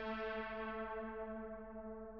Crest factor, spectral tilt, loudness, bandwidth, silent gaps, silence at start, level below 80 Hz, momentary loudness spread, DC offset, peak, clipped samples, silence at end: 14 dB; -3.5 dB/octave; -46 LUFS; 6 kHz; none; 0 s; -62 dBFS; 7 LU; under 0.1%; -32 dBFS; under 0.1%; 0 s